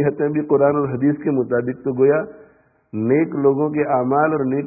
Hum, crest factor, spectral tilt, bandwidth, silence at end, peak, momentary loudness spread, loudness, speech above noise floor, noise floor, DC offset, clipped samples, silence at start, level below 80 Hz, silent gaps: none; 14 dB; -16.5 dB/octave; 2.7 kHz; 0 s; -4 dBFS; 6 LU; -19 LUFS; 28 dB; -46 dBFS; under 0.1%; under 0.1%; 0 s; -60 dBFS; none